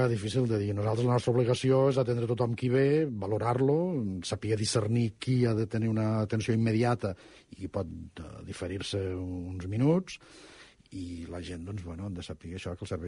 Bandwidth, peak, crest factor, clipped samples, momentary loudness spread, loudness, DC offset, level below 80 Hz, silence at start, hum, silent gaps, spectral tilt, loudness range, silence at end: 10.5 kHz; -14 dBFS; 16 dB; under 0.1%; 14 LU; -30 LUFS; under 0.1%; -56 dBFS; 0 s; none; none; -6.5 dB/octave; 7 LU; 0 s